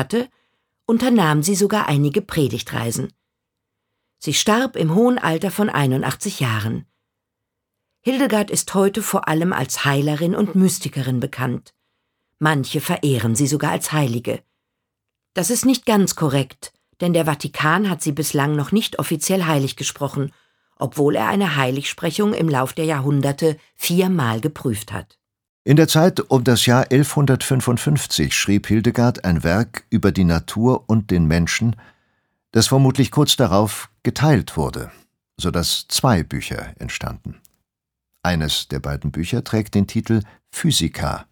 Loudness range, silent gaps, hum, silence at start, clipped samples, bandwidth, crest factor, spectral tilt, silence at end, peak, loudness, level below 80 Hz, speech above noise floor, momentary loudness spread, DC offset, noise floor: 5 LU; 25.49-25.65 s; none; 0 s; under 0.1%; over 20 kHz; 18 dB; -5 dB/octave; 0.1 s; 0 dBFS; -19 LUFS; -42 dBFS; 64 dB; 11 LU; under 0.1%; -83 dBFS